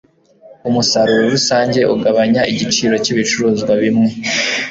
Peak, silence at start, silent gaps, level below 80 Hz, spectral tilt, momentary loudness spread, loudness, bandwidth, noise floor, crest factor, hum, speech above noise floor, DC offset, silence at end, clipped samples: -2 dBFS; 0.45 s; none; -52 dBFS; -4 dB/octave; 3 LU; -14 LUFS; 7.8 kHz; -44 dBFS; 12 dB; none; 30 dB; under 0.1%; 0 s; under 0.1%